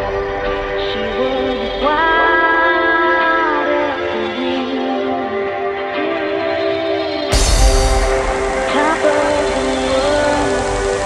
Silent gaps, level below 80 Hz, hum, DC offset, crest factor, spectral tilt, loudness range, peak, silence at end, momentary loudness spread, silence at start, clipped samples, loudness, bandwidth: none; -24 dBFS; none; under 0.1%; 14 dB; -4 dB/octave; 4 LU; 0 dBFS; 0 s; 7 LU; 0 s; under 0.1%; -16 LUFS; 13.5 kHz